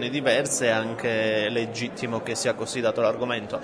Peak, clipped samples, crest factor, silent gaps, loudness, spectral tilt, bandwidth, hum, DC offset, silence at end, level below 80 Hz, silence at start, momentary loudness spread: -8 dBFS; under 0.1%; 16 dB; none; -25 LUFS; -3.5 dB/octave; 11 kHz; none; under 0.1%; 0 s; -64 dBFS; 0 s; 6 LU